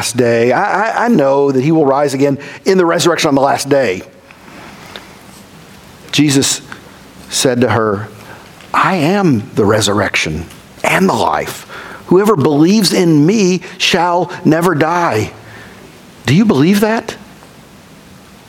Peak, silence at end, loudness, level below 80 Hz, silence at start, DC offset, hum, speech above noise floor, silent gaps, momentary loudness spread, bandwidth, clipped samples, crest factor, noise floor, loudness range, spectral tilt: 0 dBFS; 1.3 s; -12 LUFS; -46 dBFS; 0 s; under 0.1%; none; 27 dB; none; 18 LU; 18 kHz; under 0.1%; 14 dB; -39 dBFS; 5 LU; -5 dB/octave